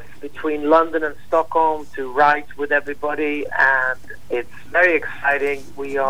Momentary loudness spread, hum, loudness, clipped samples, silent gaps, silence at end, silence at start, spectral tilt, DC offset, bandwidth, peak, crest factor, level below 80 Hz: 11 LU; none; -19 LUFS; under 0.1%; none; 0 s; 0 s; -5 dB/octave; 3%; 19.5 kHz; -2 dBFS; 16 dB; -52 dBFS